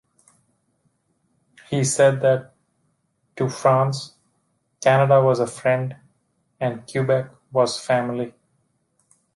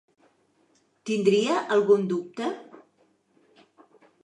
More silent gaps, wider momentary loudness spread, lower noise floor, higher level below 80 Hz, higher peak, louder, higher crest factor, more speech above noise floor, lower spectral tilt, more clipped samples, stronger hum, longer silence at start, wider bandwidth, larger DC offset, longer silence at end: neither; about the same, 11 LU vs 13 LU; about the same, -69 dBFS vs -66 dBFS; first, -66 dBFS vs -82 dBFS; first, -4 dBFS vs -8 dBFS; first, -21 LUFS vs -24 LUFS; about the same, 18 dB vs 20 dB; first, 50 dB vs 43 dB; about the same, -5.5 dB/octave vs -5.5 dB/octave; neither; neither; first, 1.7 s vs 1.05 s; about the same, 11.5 kHz vs 10.5 kHz; neither; second, 1.05 s vs 1.6 s